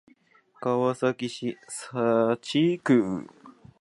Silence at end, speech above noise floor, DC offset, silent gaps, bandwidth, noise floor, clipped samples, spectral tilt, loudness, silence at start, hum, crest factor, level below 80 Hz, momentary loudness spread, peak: 0.3 s; 35 dB; under 0.1%; none; 11.5 kHz; -60 dBFS; under 0.1%; -6 dB/octave; -26 LUFS; 0.6 s; none; 18 dB; -68 dBFS; 12 LU; -10 dBFS